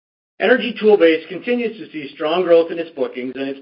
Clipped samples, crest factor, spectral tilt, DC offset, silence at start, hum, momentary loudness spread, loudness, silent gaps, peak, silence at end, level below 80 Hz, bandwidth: under 0.1%; 16 dB; -10 dB/octave; under 0.1%; 0.4 s; none; 12 LU; -17 LUFS; none; 0 dBFS; 0 s; -68 dBFS; 5.4 kHz